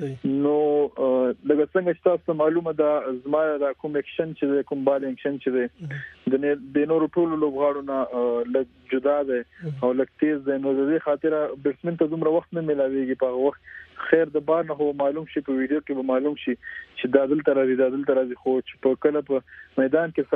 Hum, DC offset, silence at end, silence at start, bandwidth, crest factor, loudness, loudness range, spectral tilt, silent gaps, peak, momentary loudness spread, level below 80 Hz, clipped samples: none; under 0.1%; 0 s; 0 s; 4.1 kHz; 20 dB; -24 LUFS; 2 LU; -9.5 dB/octave; none; -4 dBFS; 7 LU; -64 dBFS; under 0.1%